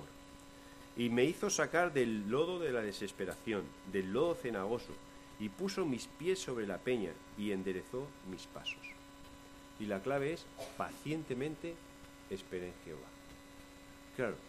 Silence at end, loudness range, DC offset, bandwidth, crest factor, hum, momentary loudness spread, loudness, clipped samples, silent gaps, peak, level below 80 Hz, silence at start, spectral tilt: 0 s; 8 LU; under 0.1%; 14.5 kHz; 22 dB; none; 22 LU; -38 LUFS; under 0.1%; none; -18 dBFS; -64 dBFS; 0 s; -4.5 dB/octave